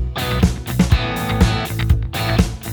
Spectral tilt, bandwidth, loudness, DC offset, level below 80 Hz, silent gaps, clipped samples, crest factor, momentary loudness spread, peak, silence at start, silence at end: -5.5 dB/octave; over 20 kHz; -18 LUFS; under 0.1%; -22 dBFS; none; under 0.1%; 18 dB; 3 LU; 0 dBFS; 0 s; 0 s